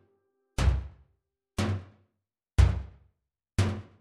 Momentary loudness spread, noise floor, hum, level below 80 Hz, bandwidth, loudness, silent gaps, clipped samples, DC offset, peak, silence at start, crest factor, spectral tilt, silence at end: 15 LU; -84 dBFS; none; -34 dBFS; 12 kHz; -30 LUFS; none; under 0.1%; under 0.1%; -10 dBFS; 0.6 s; 22 dB; -6 dB/octave; 0.2 s